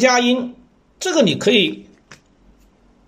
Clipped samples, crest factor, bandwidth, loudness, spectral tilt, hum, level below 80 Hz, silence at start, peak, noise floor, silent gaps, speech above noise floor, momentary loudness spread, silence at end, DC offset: under 0.1%; 18 dB; 15.5 kHz; -17 LUFS; -3.5 dB/octave; none; -58 dBFS; 0 s; -2 dBFS; -53 dBFS; none; 37 dB; 15 LU; 0.95 s; under 0.1%